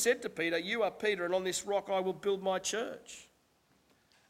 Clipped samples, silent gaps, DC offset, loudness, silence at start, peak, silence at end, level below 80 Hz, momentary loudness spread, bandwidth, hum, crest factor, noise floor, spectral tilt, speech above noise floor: under 0.1%; none; under 0.1%; -33 LUFS; 0 s; -16 dBFS; 1.05 s; -72 dBFS; 10 LU; 16.5 kHz; none; 20 dB; -71 dBFS; -2.5 dB/octave; 37 dB